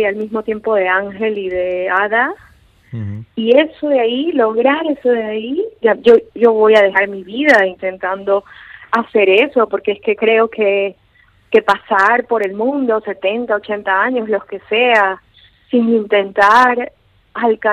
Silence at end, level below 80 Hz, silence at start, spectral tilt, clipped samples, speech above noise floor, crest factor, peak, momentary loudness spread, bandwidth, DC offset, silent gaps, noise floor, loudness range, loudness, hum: 0 s; -56 dBFS; 0 s; -5.5 dB/octave; under 0.1%; 38 dB; 14 dB; 0 dBFS; 10 LU; 8.8 kHz; under 0.1%; none; -52 dBFS; 3 LU; -14 LUFS; none